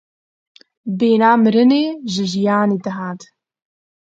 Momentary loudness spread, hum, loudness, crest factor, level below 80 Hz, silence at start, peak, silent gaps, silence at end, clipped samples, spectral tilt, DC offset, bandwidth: 15 LU; none; -16 LUFS; 18 dB; -66 dBFS; 0.85 s; 0 dBFS; none; 0.9 s; under 0.1%; -6 dB/octave; under 0.1%; 7.8 kHz